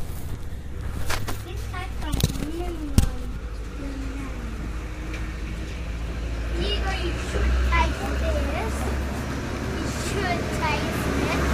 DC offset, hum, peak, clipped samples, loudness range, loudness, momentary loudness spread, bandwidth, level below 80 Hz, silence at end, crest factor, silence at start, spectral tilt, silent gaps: under 0.1%; none; -4 dBFS; under 0.1%; 5 LU; -28 LUFS; 10 LU; 15.5 kHz; -28 dBFS; 0 s; 22 dB; 0 s; -5 dB/octave; none